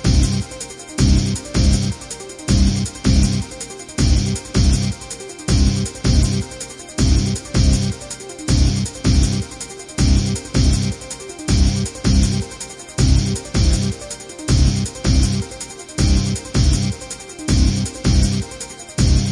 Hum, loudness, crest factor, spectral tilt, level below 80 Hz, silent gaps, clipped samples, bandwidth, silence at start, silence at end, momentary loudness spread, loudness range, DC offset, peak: none; -19 LUFS; 16 dB; -5 dB/octave; -22 dBFS; none; under 0.1%; 11.5 kHz; 0 s; 0 s; 12 LU; 0 LU; under 0.1%; -2 dBFS